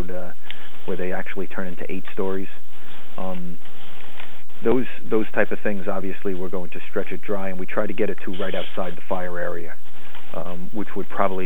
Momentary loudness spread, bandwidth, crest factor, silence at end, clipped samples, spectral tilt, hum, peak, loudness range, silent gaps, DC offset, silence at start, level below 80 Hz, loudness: 18 LU; over 20 kHz; 24 dB; 0 s; under 0.1%; -7.5 dB/octave; none; -2 dBFS; 5 LU; none; 30%; 0 s; -64 dBFS; -28 LUFS